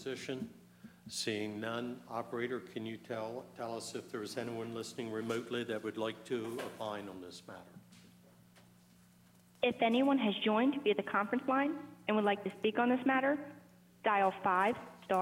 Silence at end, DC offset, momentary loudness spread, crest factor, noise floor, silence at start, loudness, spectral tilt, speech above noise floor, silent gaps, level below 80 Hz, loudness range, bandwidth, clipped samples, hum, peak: 0 s; under 0.1%; 13 LU; 18 dB; -64 dBFS; 0 s; -36 LUFS; -5 dB/octave; 29 dB; none; -80 dBFS; 10 LU; 16 kHz; under 0.1%; none; -18 dBFS